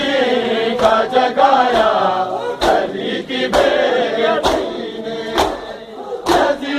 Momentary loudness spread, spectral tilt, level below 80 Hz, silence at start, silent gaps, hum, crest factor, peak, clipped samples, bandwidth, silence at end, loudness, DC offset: 12 LU; -4 dB/octave; -42 dBFS; 0 s; none; none; 16 dB; 0 dBFS; under 0.1%; 15.5 kHz; 0 s; -16 LUFS; under 0.1%